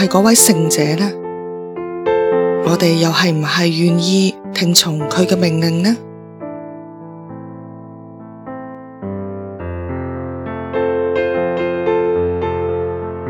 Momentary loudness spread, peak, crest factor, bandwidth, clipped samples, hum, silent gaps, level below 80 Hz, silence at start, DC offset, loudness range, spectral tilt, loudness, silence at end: 21 LU; 0 dBFS; 16 dB; over 20 kHz; under 0.1%; none; none; -46 dBFS; 0 s; under 0.1%; 15 LU; -4.5 dB/octave; -15 LUFS; 0 s